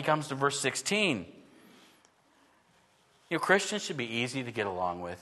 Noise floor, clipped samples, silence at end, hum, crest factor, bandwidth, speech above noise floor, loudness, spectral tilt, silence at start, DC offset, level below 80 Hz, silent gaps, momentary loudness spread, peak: -66 dBFS; under 0.1%; 0 s; none; 24 dB; 12.5 kHz; 35 dB; -30 LUFS; -3.5 dB/octave; 0 s; under 0.1%; -72 dBFS; none; 8 LU; -8 dBFS